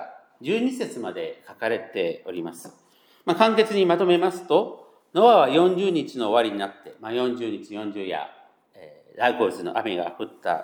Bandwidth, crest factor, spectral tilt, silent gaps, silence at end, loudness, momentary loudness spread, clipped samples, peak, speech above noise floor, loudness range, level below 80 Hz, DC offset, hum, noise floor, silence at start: 18 kHz; 20 dB; -5.5 dB/octave; none; 0 s; -23 LUFS; 15 LU; under 0.1%; -2 dBFS; 27 dB; 8 LU; -82 dBFS; under 0.1%; none; -50 dBFS; 0 s